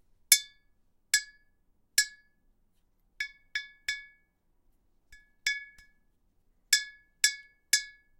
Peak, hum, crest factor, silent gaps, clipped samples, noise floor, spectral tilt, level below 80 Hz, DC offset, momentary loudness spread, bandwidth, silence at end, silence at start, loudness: -4 dBFS; none; 30 dB; none; under 0.1%; -70 dBFS; 5 dB/octave; -68 dBFS; under 0.1%; 16 LU; 16 kHz; 0.3 s; 0.3 s; -29 LUFS